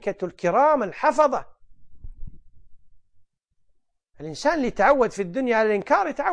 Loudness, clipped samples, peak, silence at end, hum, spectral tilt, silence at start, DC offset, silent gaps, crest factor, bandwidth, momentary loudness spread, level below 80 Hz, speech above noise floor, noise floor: -22 LUFS; under 0.1%; -6 dBFS; 0 s; none; -5.5 dB/octave; 0 s; under 0.1%; none; 18 dB; 10 kHz; 10 LU; -46 dBFS; 45 dB; -66 dBFS